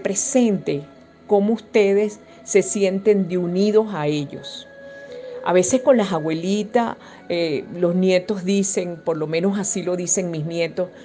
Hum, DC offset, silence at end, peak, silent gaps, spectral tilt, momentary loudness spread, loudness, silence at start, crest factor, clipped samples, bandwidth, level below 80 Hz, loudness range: none; under 0.1%; 0 s; -4 dBFS; none; -5 dB/octave; 13 LU; -20 LUFS; 0 s; 16 dB; under 0.1%; 10 kHz; -64 dBFS; 2 LU